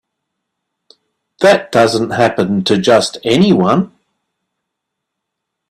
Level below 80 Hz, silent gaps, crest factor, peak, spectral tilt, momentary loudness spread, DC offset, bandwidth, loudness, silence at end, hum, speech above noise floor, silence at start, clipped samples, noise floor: -54 dBFS; none; 16 dB; 0 dBFS; -5.5 dB/octave; 4 LU; under 0.1%; 13 kHz; -12 LUFS; 1.85 s; none; 65 dB; 1.4 s; under 0.1%; -77 dBFS